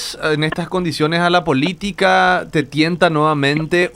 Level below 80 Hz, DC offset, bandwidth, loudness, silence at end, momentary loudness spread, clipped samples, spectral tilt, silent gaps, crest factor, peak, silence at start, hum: -46 dBFS; under 0.1%; 15.5 kHz; -16 LUFS; 0.05 s; 6 LU; under 0.1%; -5.5 dB/octave; none; 16 dB; 0 dBFS; 0 s; none